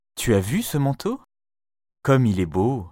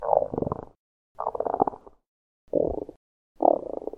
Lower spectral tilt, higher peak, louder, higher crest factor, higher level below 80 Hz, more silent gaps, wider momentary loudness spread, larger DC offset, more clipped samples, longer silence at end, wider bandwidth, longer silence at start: second, -6.5 dB/octave vs -11.5 dB/octave; second, -6 dBFS vs -2 dBFS; first, -22 LUFS vs -28 LUFS; second, 16 dB vs 26 dB; about the same, -48 dBFS vs -52 dBFS; second, none vs 0.76-1.15 s, 2.06-2.47 s, 2.96-3.35 s; second, 10 LU vs 13 LU; neither; neither; about the same, 0.05 s vs 0 s; first, 16.5 kHz vs 2.2 kHz; first, 0.15 s vs 0 s